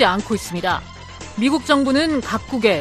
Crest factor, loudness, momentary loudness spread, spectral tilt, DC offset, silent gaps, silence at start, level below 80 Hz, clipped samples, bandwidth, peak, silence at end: 18 dB; -19 LUFS; 13 LU; -4.5 dB/octave; under 0.1%; none; 0 s; -44 dBFS; under 0.1%; 14.5 kHz; -2 dBFS; 0 s